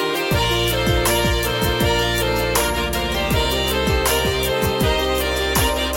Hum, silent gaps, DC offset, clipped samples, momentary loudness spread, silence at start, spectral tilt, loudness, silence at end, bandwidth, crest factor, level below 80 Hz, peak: none; none; under 0.1%; under 0.1%; 2 LU; 0 s; -3.5 dB/octave; -19 LUFS; 0 s; 17 kHz; 14 dB; -28 dBFS; -4 dBFS